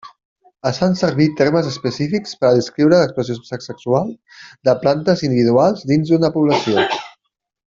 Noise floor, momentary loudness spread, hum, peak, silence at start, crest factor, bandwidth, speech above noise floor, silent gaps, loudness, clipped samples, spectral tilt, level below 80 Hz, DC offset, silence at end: -71 dBFS; 10 LU; none; -2 dBFS; 0.05 s; 14 dB; 7.6 kHz; 54 dB; 0.25-0.36 s; -17 LUFS; under 0.1%; -6.5 dB/octave; -56 dBFS; under 0.1%; 0.6 s